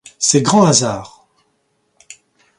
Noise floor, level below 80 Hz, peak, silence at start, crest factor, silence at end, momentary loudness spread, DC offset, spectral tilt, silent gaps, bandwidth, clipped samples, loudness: -64 dBFS; -54 dBFS; 0 dBFS; 0.2 s; 18 dB; 1.5 s; 12 LU; under 0.1%; -4 dB/octave; none; 11.5 kHz; under 0.1%; -13 LUFS